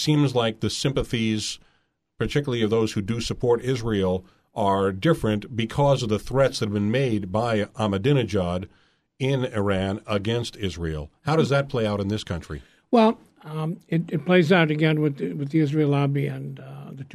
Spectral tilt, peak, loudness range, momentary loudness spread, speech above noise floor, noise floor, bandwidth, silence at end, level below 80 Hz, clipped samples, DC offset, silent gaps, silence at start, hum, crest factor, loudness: -6 dB/octave; -4 dBFS; 3 LU; 11 LU; 45 dB; -68 dBFS; 13.5 kHz; 0.1 s; -46 dBFS; under 0.1%; under 0.1%; none; 0 s; none; 20 dB; -24 LUFS